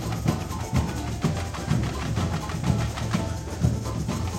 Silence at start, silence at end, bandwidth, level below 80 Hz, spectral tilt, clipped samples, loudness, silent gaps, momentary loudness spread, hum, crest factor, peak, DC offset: 0 s; 0 s; 16 kHz; -36 dBFS; -6 dB/octave; under 0.1%; -27 LUFS; none; 3 LU; none; 18 dB; -8 dBFS; under 0.1%